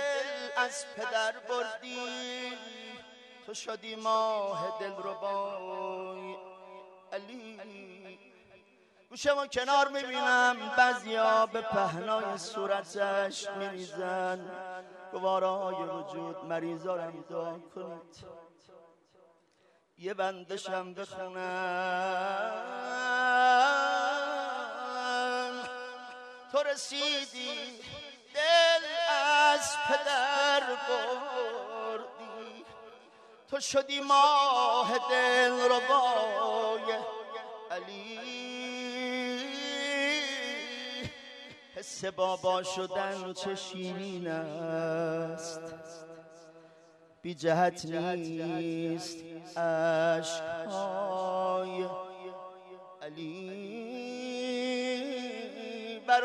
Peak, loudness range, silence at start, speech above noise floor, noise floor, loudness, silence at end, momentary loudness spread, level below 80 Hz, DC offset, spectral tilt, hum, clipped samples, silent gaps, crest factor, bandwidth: -12 dBFS; 11 LU; 0 s; 37 dB; -68 dBFS; -31 LUFS; 0 s; 19 LU; -76 dBFS; under 0.1%; -3 dB/octave; none; under 0.1%; none; 20 dB; 13 kHz